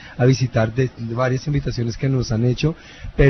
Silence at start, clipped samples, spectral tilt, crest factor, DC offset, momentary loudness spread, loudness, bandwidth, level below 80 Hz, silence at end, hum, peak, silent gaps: 0 s; under 0.1%; -7 dB/octave; 18 dB; under 0.1%; 6 LU; -21 LUFS; 6.4 kHz; -32 dBFS; 0 s; none; -2 dBFS; none